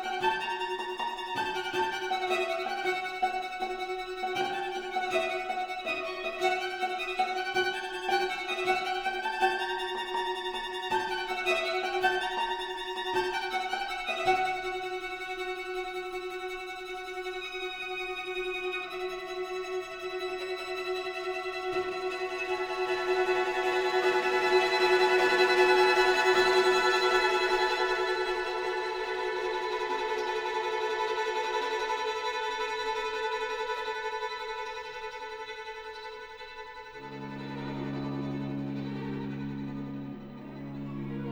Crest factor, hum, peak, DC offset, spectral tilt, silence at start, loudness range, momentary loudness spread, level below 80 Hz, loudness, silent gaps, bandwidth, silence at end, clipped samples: 20 dB; none; -10 dBFS; under 0.1%; -4 dB/octave; 0 s; 12 LU; 13 LU; -60 dBFS; -30 LUFS; none; 20 kHz; 0 s; under 0.1%